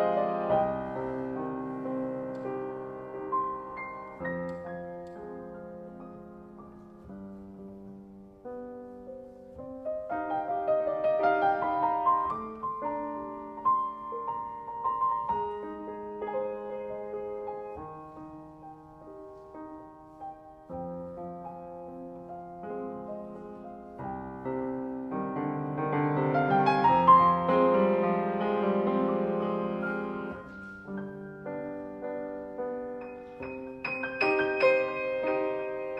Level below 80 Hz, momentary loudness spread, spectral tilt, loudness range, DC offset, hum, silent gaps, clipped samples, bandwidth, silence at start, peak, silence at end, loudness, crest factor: -62 dBFS; 21 LU; -8.5 dB/octave; 19 LU; under 0.1%; none; none; under 0.1%; 7.6 kHz; 0 s; -8 dBFS; 0 s; -30 LUFS; 24 dB